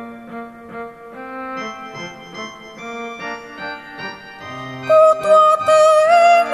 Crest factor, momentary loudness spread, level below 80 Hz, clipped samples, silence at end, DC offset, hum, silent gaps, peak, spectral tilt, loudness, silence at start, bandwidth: 14 dB; 22 LU; -60 dBFS; under 0.1%; 0 s; under 0.1%; none; none; -2 dBFS; -3.5 dB/octave; -12 LUFS; 0 s; 12.5 kHz